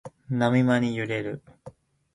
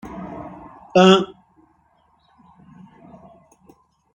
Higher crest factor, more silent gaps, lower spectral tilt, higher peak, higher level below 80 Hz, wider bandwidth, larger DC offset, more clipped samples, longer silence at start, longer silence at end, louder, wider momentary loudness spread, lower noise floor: about the same, 18 dB vs 22 dB; neither; first, -7.5 dB/octave vs -5.5 dB/octave; second, -8 dBFS vs -2 dBFS; about the same, -62 dBFS vs -58 dBFS; first, 10.5 kHz vs 8 kHz; neither; neither; about the same, 0.05 s vs 0.05 s; second, 0.45 s vs 2.9 s; second, -25 LUFS vs -16 LUFS; second, 13 LU vs 25 LU; second, -49 dBFS vs -61 dBFS